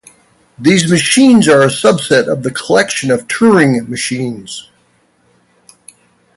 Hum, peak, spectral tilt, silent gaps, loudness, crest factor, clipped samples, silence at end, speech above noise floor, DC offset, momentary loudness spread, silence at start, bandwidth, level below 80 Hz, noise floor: none; 0 dBFS; -4.5 dB/octave; none; -11 LUFS; 12 dB; under 0.1%; 1.75 s; 44 dB; under 0.1%; 12 LU; 0.6 s; 11.5 kHz; -52 dBFS; -54 dBFS